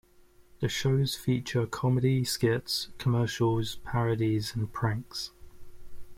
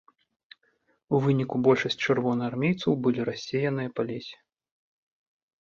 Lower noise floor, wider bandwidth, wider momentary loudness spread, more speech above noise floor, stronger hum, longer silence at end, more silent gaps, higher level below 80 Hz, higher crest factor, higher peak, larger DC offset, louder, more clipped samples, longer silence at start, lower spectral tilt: second, -58 dBFS vs -70 dBFS; first, 16.5 kHz vs 7.4 kHz; about the same, 7 LU vs 9 LU; second, 30 dB vs 44 dB; neither; second, 0.05 s vs 1.25 s; neither; first, -52 dBFS vs -66 dBFS; about the same, 16 dB vs 20 dB; second, -14 dBFS vs -8 dBFS; neither; second, -29 LUFS vs -26 LUFS; neither; second, 0.55 s vs 1.1 s; second, -5.5 dB/octave vs -7 dB/octave